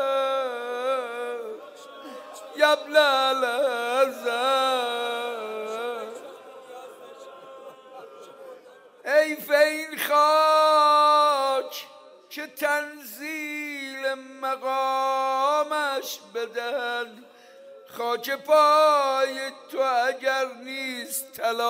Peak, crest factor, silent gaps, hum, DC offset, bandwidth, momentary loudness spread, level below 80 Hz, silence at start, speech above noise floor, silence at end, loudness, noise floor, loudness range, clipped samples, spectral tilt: -4 dBFS; 20 dB; none; none; under 0.1%; 16 kHz; 24 LU; -90 dBFS; 0 s; 26 dB; 0 s; -24 LUFS; -50 dBFS; 10 LU; under 0.1%; -0.5 dB/octave